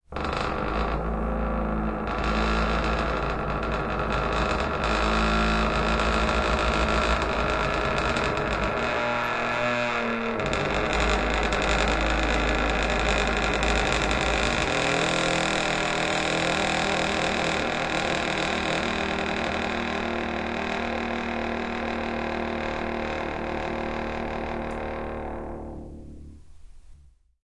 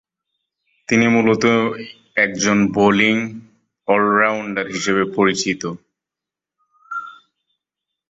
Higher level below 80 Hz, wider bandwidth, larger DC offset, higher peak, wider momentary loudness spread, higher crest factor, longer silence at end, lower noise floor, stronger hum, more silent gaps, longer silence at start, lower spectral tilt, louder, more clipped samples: first, -34 dBFS vs -56 dBFS; first, 11 kHz vs 8 kHz; neither; second, -6 dBFS vs -2 dBFS; second, 7 LU vs 16 LU; about the same, 20 dB vs 18 dB; second, 0.5 s vs 1 s; second, -53 dBFS vs -87 dBFS; neither; neither; second, 0.1 s vs 0.9 s; about the same, -4.5 dB/octave vs -4.5 dB/octave; second, -25 LUFS vs -17 LUFS; neither